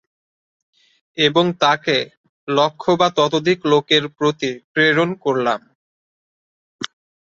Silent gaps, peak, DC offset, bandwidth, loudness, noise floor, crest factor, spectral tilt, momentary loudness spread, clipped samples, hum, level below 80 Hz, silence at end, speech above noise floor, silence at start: 2.17-2.47 s, 4.64-4.75 s, 5.75-6.79 s; -2 dBFS; under 0.1%; 7.8 kHz; -17 LUFS; under -90 dBFS; 18 dB; -4.5 dB/octave; 16 LU; under 0.1%; none; -62 dBFS; 0.45 s; over 73 dB; 1.15 s